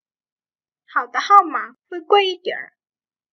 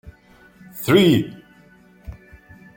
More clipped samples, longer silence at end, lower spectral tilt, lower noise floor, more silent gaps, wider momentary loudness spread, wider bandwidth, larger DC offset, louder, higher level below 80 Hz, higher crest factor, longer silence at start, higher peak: neither; about the same, 0.65 s vs 0.65 s; second, -1.5 dB/octave vs -6 dB/octave; first, under -90 dBFS vs -51 dBFS; neither; second, 17 LU vs 27 LU; second, 6.4 kHz vs 17 kHz; neither; about the same, -18 LUFS vs -17 LUFS; second, -78 dBFS vs -48 dBFS; about the same, 20 dB vs 20 dB; first, 0.95 s vs 0.05 s; about the same, 0 dBFS vs -2 dBFS